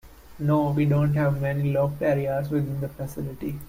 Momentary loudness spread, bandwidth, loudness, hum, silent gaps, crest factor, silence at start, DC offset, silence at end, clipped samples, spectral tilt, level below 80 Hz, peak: 11 LU; 16 kHz; -25 LUFS; none; none; 14 dB; 0.05 s; under 0.1%; 0 s; under 0.1%; -9 dB/octave; -48 dBFS; -12 dBFS